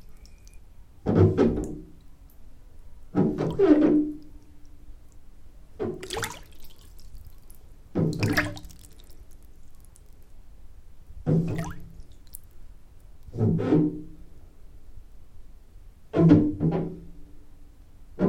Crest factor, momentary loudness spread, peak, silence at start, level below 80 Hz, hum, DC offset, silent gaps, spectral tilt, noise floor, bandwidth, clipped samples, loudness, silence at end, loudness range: 24 dB; 25 LU; -4 dBFS; 0.1 s; -46 dBFS; none; under 0.1%; none; -7.5 dB/octave; -47 dBFS; 16 kHz; under 0.1%; -25 LUFS; 0 s; 9 LU